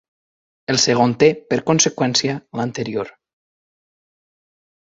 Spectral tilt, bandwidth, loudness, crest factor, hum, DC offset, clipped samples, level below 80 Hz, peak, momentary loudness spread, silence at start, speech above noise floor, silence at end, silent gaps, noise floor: -3.5 dB/octave; 8 kHz; -18 LUFS; 20 dB; none; under 0.1%; under 0.1%; -60 dBFS; -2 dBFS; 11 LU; 0.7 s; over 72 dB; 1.75 s; none; under -90 dBFS